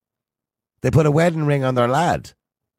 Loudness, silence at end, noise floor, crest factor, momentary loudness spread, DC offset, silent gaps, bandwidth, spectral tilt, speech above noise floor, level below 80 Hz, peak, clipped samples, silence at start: -18 LUFS; 0.5 s; -88 dBFS; 16 dB; 7 LU; under 0.1%; none; 14 kHz; -7 dB/octave; 70 dB; -46 dBFS; -4 dBFS; under 0.1%; 0.85 s